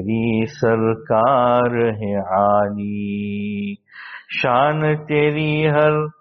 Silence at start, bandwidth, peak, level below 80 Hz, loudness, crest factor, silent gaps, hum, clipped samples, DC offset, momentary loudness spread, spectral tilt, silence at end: 0 s; 6.2 kHz; -4 dBFS; -54 dBFS; -18 LUFS; 16 dB; none; none; under 0.1%; under 0.1%; 10 LU; -5.5 dB/octave; 0.1 s